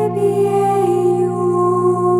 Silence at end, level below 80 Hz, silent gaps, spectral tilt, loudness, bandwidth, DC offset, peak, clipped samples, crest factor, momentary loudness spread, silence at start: 0 s; -56 dBFS; none; -8 dB/octave; -16 LUFS; 12 kHz; under 0.1%; -4 dBFS; under 0.1%; 10 dB; 2 LU; 0 s